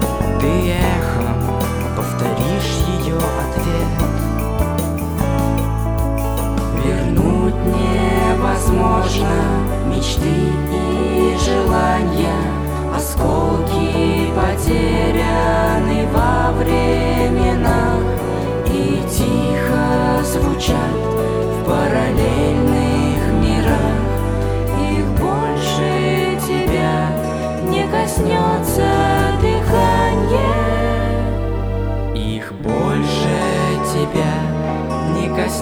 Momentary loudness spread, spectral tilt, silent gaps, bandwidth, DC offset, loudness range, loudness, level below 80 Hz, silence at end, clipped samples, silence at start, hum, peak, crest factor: 4 LU; -6 dB/octave; none; over 20 kHz; under 0.1%; 3 LU; -17 LUFS; -24 dBFS; 0 s; under 0.1%; 0 s; none; -2 dBFS; 14 dB